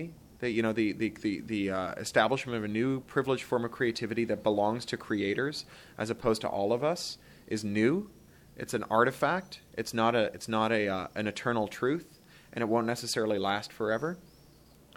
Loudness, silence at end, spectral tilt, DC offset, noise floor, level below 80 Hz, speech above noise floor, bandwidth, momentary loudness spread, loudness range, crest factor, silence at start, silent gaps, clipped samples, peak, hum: -31 LUFS; 0.7 s; -5 dB/octave; under 0.1%; -58 dBFS; -62 dBFS; 27 dB; 17 kHz; 10 LU; 2 LU; 22 dB; 0 s; none; under 0.1%; -10 dBFS; none